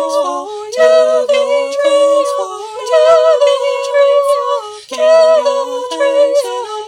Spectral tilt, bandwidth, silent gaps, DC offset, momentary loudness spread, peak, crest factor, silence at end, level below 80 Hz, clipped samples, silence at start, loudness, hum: -0.5 dB/octave; 14 kHz; none; under 0.1%; 11 LU; 0 dBFS; 12 dB; 0 s; -70 dBFS; under 0.1%; 0 s; -12 LUFS; none